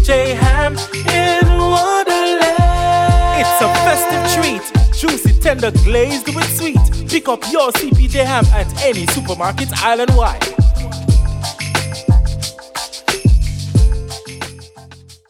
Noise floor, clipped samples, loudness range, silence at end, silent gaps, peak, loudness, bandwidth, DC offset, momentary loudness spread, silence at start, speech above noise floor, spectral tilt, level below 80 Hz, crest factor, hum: -39 dBFS; under 0.1%; 4 LU; 0.35 s; none; 0 dBFS; -14 LUFS; 17 kHz; under 0.1%; 7 LU; 0 s; 26 dB; -5 dB/octave; -18 dBFS; 14 dB; none